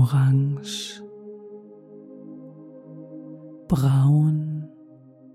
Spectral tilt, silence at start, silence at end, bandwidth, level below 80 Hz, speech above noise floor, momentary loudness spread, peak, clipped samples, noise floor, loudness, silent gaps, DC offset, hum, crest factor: -7 dB/octave; 0 s; 0.7 s; 13 kHz; -52 dBFS; 29 dB; 25 LU; -8 dBFS; under 0.1%; -49 dBFS; -22 LUFS; none; under 0.1%; none; 16 dB